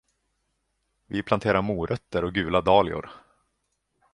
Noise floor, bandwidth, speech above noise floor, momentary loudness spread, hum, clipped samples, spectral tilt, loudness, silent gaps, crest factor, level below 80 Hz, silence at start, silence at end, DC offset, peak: -76 dBFS; 10.5 kHz; 52 dB; 13 LU; none; under 0.1%; -7 dB/octave; -25 LUFS; none; 22 dB; -48 dBFS; 1.1 s; 0.95 s; under 0.1%; -6 dBFS